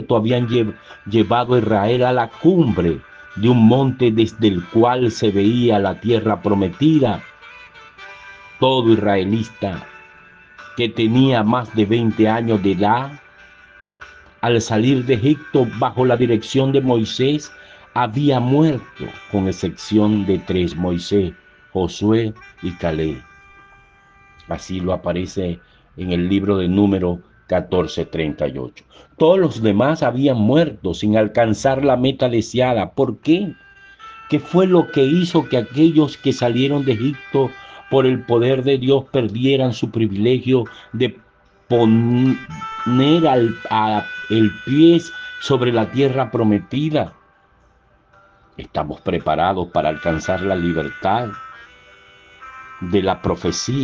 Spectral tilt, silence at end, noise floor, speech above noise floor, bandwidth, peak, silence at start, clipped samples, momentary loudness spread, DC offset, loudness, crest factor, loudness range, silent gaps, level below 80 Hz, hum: -7 dB/octave; 0 s; -55 dBFS; 38 dB; 7.8 kHz; -2 dBFS; 0 s; under 0.1%; 12 LU; under 0.1%; -18 LUFS; 16 dB; 6 LU; none; -50 dBFS; none